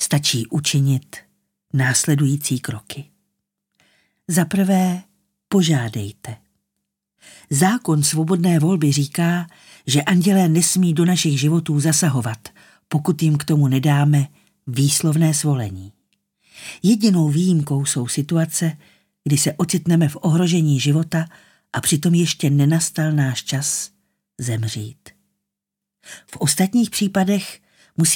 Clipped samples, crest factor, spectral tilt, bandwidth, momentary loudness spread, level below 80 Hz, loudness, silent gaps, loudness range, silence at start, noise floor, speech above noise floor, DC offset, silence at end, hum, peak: under 0.1%; 16 dB; -5 dB/octave; 17.5 kHz; 14 LU; -62 dBFS; -18 LUFS; none; 5 LU; 0 s; -84 dBFS; 66 dB; under 0.1%; 0 s; none; -4 dBFS